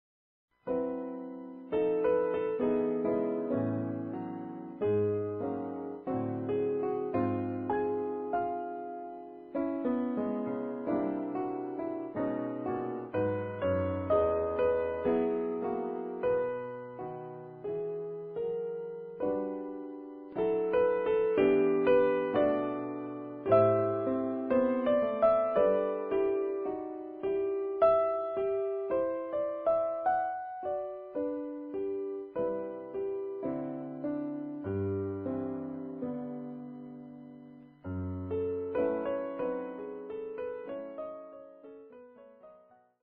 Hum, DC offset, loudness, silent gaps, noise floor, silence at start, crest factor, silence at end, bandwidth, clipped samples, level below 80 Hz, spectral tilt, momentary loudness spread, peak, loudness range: none; under 0.1%; -32 LUFS; none; -61 dBFS; 0.65 s; 18 dB; 0.45 s; 4.3 kHz; under 0.1%; -64 dBFS; -7 dB/octave; 14 LU; -14 dBFS; 9 LU